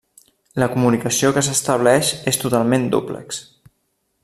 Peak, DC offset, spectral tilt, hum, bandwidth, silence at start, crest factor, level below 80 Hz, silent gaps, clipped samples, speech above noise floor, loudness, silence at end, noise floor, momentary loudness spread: -2 dBFS; under 0.1%; -4 dB/octave; none; 14.5 kHz; 0.55 s; 18 dB; -54 dBFS; none; under 0.1%; 51 dB; -18 LUFS; 0.8 s; -69 dBFS; 13 LU